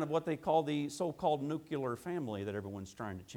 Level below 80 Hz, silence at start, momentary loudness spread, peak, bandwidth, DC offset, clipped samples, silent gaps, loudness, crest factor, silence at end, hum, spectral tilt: -70 dBFS; 0 s; 11 LU; -18 dBFS; 19 kHz; under 0.1%; under 0.1%; none; -37 LUFS; 18 dB; 0 s; none; -6.5 dB/octave